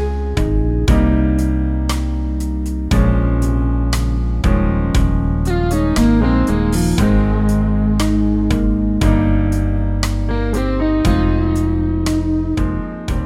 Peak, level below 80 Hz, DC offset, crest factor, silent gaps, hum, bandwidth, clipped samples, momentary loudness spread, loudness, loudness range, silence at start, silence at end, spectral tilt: -2 dBFS; -18 dBFS; under 0.1%; 14 dB; none; none; 14.5 kHz; under 0.1%; 5 LU; -17 LUFS; 2 LU; 0 s; 0 s; -7 dB/octave